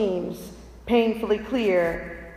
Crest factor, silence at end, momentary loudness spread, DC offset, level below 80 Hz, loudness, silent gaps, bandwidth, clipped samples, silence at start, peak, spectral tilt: 16 dB; 0 s; 17 LU; under 0.1%; -46 dBFS; -24 LUFS; none; 15.5 kHz; under 0.1%; 0 s; -8 dBFS; -6 dB/octave